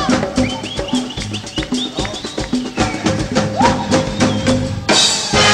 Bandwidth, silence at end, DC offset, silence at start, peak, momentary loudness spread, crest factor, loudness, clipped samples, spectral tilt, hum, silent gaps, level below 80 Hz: 13.5 kHz; 0 s; under 0.1%; 0 s; -2 dBFS; 11 LU; 16 dB; -16 LUFS; under 0.1%; -3.5 dB/octave; none; none; -34 dBFS